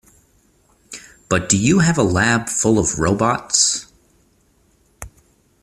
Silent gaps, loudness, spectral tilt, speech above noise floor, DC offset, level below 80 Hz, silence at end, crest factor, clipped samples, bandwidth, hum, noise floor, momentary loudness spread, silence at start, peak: none; -16 LUFS; -4 dB/octave; 42 dB; under 0.1%; -44 dBFS; 0.55 s; 20 dB; under 0.1%; 14.5 kHz; none; -58 dBFS; 23 LU; 0.9 s; 0 dBFS